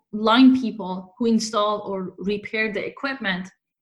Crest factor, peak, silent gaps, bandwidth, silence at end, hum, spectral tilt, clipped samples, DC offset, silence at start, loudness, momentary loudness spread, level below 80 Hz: 16 dB; -6 dBFS; none; 11 kHz; 0.35 s; none; -5 dB/octave; under 0.1%; under 0.1%; 0.15 s; -22 LUFS; 15 LU; -62 dBFS